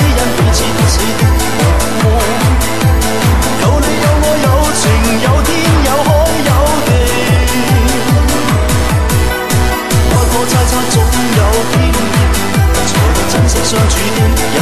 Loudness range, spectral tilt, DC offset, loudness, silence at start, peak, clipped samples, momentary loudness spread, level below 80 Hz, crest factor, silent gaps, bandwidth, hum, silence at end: 1 LU; -4.5 dB/octave; 6%; -11 LUFS; 0 s; 0 dBFS; under 0.1%; 1 LU; -16 dBFS; 10 dB; none; 13.5 kHz; none; 0 s